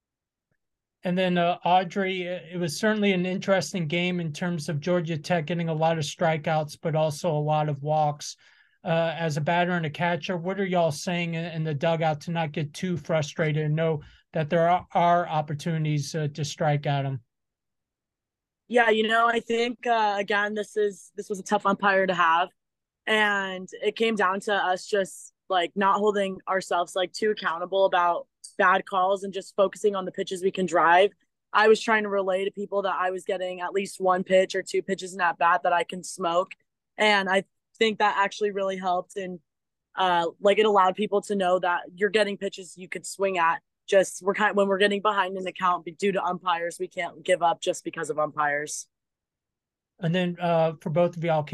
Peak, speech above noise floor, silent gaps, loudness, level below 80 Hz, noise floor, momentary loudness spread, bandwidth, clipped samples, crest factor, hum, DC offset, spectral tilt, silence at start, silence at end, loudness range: -8 dBFS; 63 dB; none; -25 LUFS; -70 dBFS; -88 dBFS; 9 LU; 12.5 kHz; under 0.1%; 18 dB; none; under 0.1%; -5 dB/octave; 1.05 s; 0 s; 3 LU